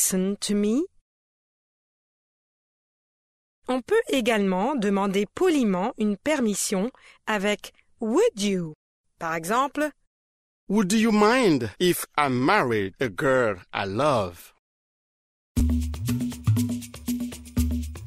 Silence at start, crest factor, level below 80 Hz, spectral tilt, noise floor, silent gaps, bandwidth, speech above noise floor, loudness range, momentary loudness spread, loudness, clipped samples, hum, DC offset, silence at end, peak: 0 s; 20 dB; -40 dBFS; -5 dB/octave; under -90 dBFS; 1.01-3.62 s, 8.75-9.04 s, 10.07-10.67 s, 14.59-15.55 s; 16 kHz; over 67 dB; 6 LU; 10 LU; -24 LUFS; under 0.1%; none; under 0.1%; 0 s; -6 dBFS